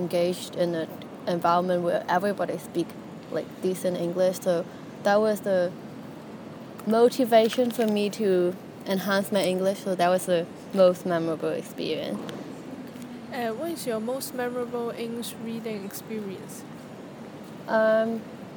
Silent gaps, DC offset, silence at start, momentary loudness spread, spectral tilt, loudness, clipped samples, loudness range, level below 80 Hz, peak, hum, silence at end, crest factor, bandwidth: none; under 0.1%; 0 s; 18 LU; -5.5 dB/octave; -26 LUFS; under 0.1%; 8 LU; -72 dBFS; -8 dBFS; none; 0 s; 18 dB; 19 kHz